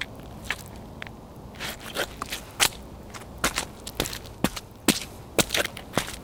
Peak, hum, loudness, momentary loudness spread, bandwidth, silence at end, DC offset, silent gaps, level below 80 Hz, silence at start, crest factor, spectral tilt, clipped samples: -2 dBFS; none; -28 LUFS; 17 LU; 19 kHz; 0 s; under 0.1%; none; -46 dBFS; 0 s; 28 dB; -2.5 dB/octave; under 0.1%